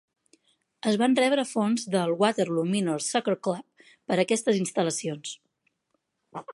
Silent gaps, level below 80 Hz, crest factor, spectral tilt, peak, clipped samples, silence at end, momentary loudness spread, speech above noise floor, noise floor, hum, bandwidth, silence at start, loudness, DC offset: none; -76 dBFS; 18 dB; -4.5 dB/octave; -8 dBFS; under 0.1%; 0 s; 14 LU; 51 dB; -77 dBFS; none; 11.5 kHz; 0.85 s; -26 LUFS; under 0.1%